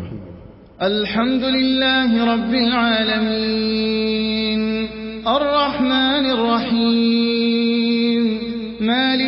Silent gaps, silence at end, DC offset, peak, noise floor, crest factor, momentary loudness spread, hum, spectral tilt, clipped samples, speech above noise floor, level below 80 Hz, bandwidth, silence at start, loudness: none; 0 s; under 0.1%; -4 dBFS; -40 dBFS; 14 dB; 7 LU; none; -9.5 dB/octave; under 0.1%; 22 dB; -46 dBFS; 5.8 kHz; 0 s; -18 LUFS